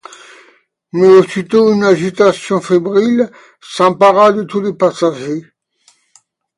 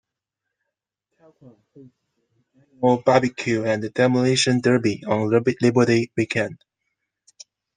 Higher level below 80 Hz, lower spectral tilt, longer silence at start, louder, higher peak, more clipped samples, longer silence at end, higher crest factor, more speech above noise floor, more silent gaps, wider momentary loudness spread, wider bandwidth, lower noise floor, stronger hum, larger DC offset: about the same, -60 dBFS vs -64 dBFS; about the same, -6 dB/octave vs -5.5 dB/octave; second, 0.95 s vs 1.75 s; first, -12 LUFS vs -20 LUFS; about the same, 0 dBFS vs -2 dBFS; neither; about the same, 1.15 s vs 1.25 s; second, 12 dB vs 20 dB; second, 43 dB vs 62 dB; neither; first, 13 LU vs 6 LU; first, 11 kHz vs 9.8 kHz; second, -54 dBFS vs -83 dBFS; neither; neither